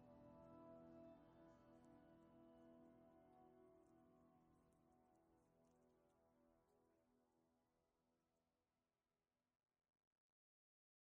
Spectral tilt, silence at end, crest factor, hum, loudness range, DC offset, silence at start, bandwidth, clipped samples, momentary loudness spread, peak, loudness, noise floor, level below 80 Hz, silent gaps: -5.5 dB/octave; 1.6 s; 18 dB; none; 2 LU; under 0.1%; 0 s; 3.9 kHz; under 0.1%; 5 LU; -54 dBFS; -67 LUFS; under -90 dBFS; -90 dBFS; none